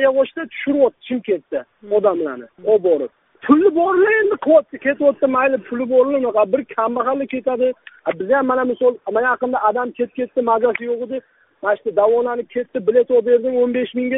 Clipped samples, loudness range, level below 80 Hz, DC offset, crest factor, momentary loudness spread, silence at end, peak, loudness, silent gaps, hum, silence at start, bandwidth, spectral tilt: under 0.1%; 4 LU; -64 dBFS; under 0.1%; 18 dB; 10 LU; 0 s; 0 dBFS; -18 LUFS; none; none; 0 s; 3.9 kHz; -3.5 dB/octave